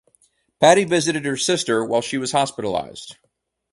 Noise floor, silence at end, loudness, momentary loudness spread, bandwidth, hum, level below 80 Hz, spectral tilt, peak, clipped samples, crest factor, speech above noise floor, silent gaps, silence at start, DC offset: -62 dBFS; 0.6 s; -19 LUFS; 14 LU; 11.5 kHz; none; -60 dBFS; -3.5 dB/octave; 0 dBFS; under 0.1%; 20 dB; 42 dB; none; 0.6 s; under 0.1%